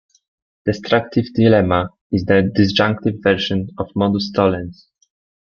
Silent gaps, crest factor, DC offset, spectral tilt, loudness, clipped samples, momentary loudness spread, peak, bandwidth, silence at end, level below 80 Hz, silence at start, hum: 2.01-2.10 s; 16 dB; under 0.1%; -7 dB/octave; -17 LUFS; under 0.1%; 9 LU; -2 dBFS; 7 kHz; 0.7 s; -50 dBFS; 0.65 s; none